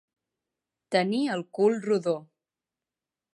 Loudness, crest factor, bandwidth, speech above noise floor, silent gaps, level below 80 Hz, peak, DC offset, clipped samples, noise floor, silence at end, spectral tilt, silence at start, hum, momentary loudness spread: -27 LUFS; 20 dB; 11.5 kHz; over 64 dB; none; -84 dBFS; -10 dBFS; under 0.1%; under 0.1%; under -90 dBFS; 1.1 s; -6 dB/octave; 0.9 s; none; 6 LU